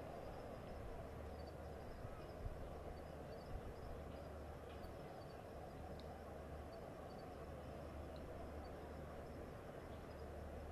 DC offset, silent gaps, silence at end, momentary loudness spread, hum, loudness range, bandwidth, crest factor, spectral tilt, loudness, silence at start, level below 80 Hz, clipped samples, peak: under 0.1%; none; 0 s; 1 LU; none; 1 LU; 13 kHz; 16 dB; -7 dB/octave; -54 LUFS; 0 s; -58 dBFS; under 0.1%; -36 dBFS